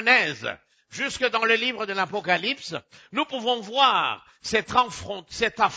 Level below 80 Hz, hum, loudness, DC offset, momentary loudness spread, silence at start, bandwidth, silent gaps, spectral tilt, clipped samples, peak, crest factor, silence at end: -58 dBFS; none; -24 LUFS; under 0.1%; 14 LU; 0 s; 8 kHz; none; -2.5 dB/octave; under 0.1%; -6 dBFS; 20 dB; 0 s